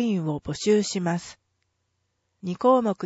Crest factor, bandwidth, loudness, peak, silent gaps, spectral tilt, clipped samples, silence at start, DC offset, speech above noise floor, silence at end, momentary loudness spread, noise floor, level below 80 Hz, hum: 18 dB; 8 kHz; -24 LUFS; -8 dBFS; none; -5.5 dB/octave; under 0.1%; 0 s; under 0.1%; 51 dB; 0 s; 14 LU; -75 dBFS; -60 dBFS; none